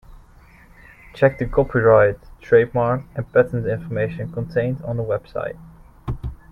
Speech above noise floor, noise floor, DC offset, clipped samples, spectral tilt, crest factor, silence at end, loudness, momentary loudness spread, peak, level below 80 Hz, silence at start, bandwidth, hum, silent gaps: 29 dB; -48 dBFS; under 0.1%; under 0.1%; -9.5 dB/octave; 20 dB; 0.15 s; -20 LUFS; 16 LU; 0 dBFS; -40 dBFS; 0.1 s; 5.8 kHz; none; none